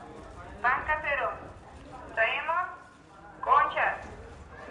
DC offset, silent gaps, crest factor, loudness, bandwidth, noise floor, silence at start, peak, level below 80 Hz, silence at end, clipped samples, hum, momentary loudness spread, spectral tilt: under 0.1%; none; 22 dB; -28 LUFS; 11 kHz; -51 dBFS; 0 s; -10 dBFS; -54 dBFS; 0 s; under 0.1%; none; 23 LU; -4.5 dB/octave